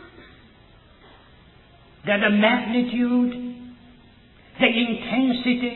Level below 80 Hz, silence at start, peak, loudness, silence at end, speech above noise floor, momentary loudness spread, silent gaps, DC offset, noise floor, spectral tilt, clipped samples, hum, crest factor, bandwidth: -56 dBFS; 0 s; -4 dBFS; -21 LUFS; 0 s; 32 dB; 16 LU; none; under 0.1%; -51 dBFS; -8.5 dB/octave; under 0.1%; none; 22 dB; 4.2 kHz